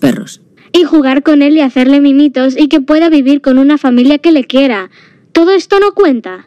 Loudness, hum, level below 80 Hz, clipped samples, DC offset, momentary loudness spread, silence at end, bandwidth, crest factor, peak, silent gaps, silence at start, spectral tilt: -8 LUFS; none; -46 dBFS; under 0.1%; 0.3%; 6 LU; 0.1 s; 11.5 kHz; 8 dB; 0 dBFS; none; 0 s; -5.5 dB/octave